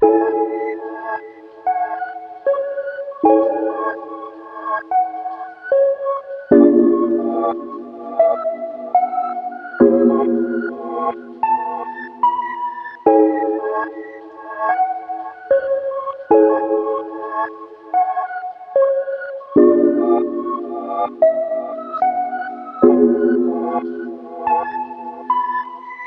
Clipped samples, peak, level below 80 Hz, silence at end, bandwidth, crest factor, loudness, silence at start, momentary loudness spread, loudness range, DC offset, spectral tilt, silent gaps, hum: under 0.1%; 0 dBFS; -62 dBFS; 0 s; 3.8 kHz; 18 dB; -18 LUFS; 0 s; 15 LU; 4 LU; under 0.1%; -9.5 dB/octave; none; none